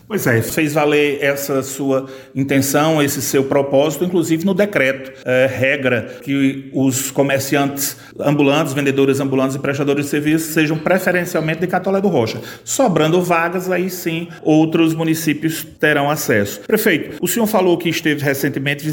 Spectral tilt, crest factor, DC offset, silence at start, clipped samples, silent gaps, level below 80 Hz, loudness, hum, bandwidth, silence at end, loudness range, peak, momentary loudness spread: -5 dB/octave; 16 dB; under 0.1%; 0.1 s; under 0.1%; none; -56 dBFS; -17 LUFS; none; 17 kHz; 0 s; 1 LU; -2 dBFS; 6 LU